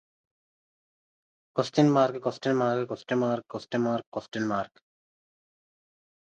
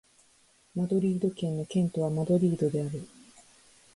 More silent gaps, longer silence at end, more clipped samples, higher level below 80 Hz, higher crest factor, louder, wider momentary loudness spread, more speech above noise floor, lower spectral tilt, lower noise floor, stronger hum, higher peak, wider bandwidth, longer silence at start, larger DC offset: first, 4.07-4.12 s vs none; first, 1.75 s vs 0.9 s; neither; second, -72 dBFS vs -66 dBFS; first, 22 dB vs 16 dB; about the same, -28 LUFS vs -29 LUFS; about the same, 11 LU vs 12 LU; first, over 63 dB vs 36 dB; second, -6.5 dB/octave vs -8.5 dB/octave; first, under -90 dBFS vs -63 dBFS; neither; first, -8 dBFS vs -14 dBFS; second, 9 kHz vs 11.5 kHz; first, 1.55 s vs 0.75 s; neither